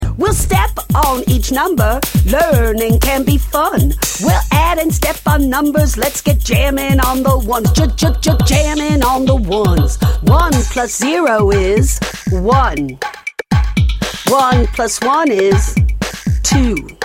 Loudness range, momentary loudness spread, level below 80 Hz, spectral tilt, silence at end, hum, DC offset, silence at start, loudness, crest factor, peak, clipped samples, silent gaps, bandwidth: 2 LU; 5 LU; -18 dBFS; -5 dB/octave; 0 s; none; under 0.1%; 0 s; -13 LUFS; 12 dB; 0 dBFS; under 0.1%; none; 17 kHz